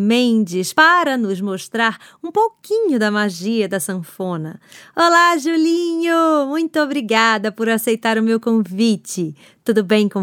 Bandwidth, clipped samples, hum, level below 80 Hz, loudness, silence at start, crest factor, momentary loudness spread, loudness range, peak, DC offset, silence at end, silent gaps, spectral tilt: 17.5 kHz; under 0.1%; none; -74 dBFS; -17 LUFS; 0 s; 16 dB; 12 LU; 4 LU; 0 dBFS; under 0.1%; 0 s; none; -4.5 dB/octave